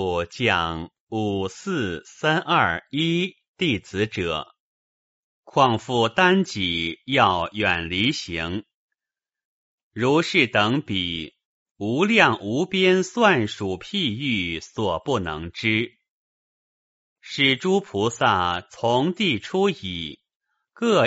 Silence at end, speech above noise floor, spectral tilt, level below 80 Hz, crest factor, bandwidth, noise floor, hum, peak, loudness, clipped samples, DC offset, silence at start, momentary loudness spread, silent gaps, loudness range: 0 s; over 68 dB; -3 dB/octave; -54 dBFS; 22 dB; 8 kHz; under -90 dBFS; none; 0 dBFS; -22 LUFS; under 0.1%; under 0.1%; 0 s; 11 LU; 1.00-1.07 s, 3.48-3.54 s, 4.59-5.43 s, 8.74-8.89 s, 9.45-9.91 s, 11.45-11.75 s, 16.08-17.16 s, 20.36-20.40 s; 4 LU